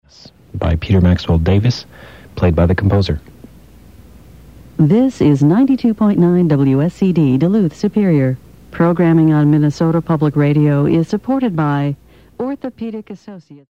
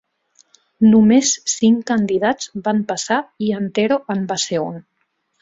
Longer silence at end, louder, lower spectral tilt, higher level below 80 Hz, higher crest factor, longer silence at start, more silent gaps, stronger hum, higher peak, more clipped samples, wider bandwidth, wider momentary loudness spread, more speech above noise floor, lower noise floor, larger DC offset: second, 0.15 s vs 0.6 s; first, -14 LUFS vs -17 LUFS; first, -8.5 dB/octave vs -4.5 dB/octave; first, -34 dBFS vs -58 dBFS; about the same, 14 dB vs 14 dB; second, 0.55 s vs 0.8 s; neither; neither; about the same, -2 dBFS vs -2 dBFS; neither; about the same, 8.2 kHz vs 7.8 kHz; about the same, 13 LU vs 11 LU; second, 30 dB vs 52 dB; second, -43 dBFS vs -69 dBFS; first, 0.3% vs under 0.1%